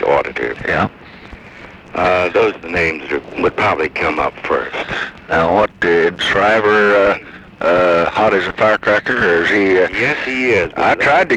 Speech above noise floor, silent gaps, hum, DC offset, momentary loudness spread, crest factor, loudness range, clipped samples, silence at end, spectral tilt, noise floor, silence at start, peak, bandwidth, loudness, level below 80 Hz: 22 dB; none; none; under 0.1%; 9 LU; 14 dB; 4 LU; under 0.1%; 0 s; -5.5 dB/octave; -37 dBFS; 0 s; -2 dBFS; 10.5 kHz; -14 LUFS; -42 dBFS